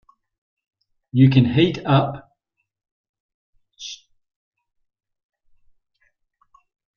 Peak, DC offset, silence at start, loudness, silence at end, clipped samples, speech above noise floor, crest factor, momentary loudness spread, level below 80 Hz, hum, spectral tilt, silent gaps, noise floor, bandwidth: -2 dBFS; under 0.1%; 1.15 s; -18 LUFS; 3 s; under 0.1%; 59 dB; 22 dB; 22 LU; -56 dBFS; none; -7.5 dB/octave; 2.91-3.14 s, 3.20-3.53 s; -75 dBFS; 6.8 kHz